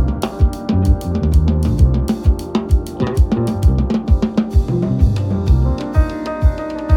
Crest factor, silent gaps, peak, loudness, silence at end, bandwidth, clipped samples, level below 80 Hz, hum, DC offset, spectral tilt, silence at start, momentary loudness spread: 14 dB; none; 0 dBFS; -17 LUFS; 0 s; 12.5 kHz; under 0.1%; -18 dBFS; none; under 0.1%; -8.5 dB/octave; 0 s; 3 LU